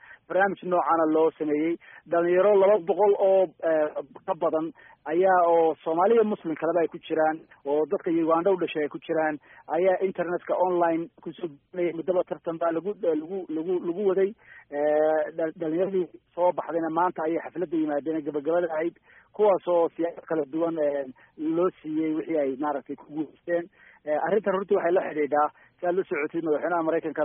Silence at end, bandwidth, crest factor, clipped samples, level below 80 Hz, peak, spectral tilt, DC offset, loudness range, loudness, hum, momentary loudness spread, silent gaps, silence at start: 0 s; 3.7 kHz; 16 dB; under 0.1%; -74 dBFS; -10 dBFS; -1.5 dB/octave; under 0.1%; 5 LU; -26 LUFS; none; 11 LU; none; 0.1 s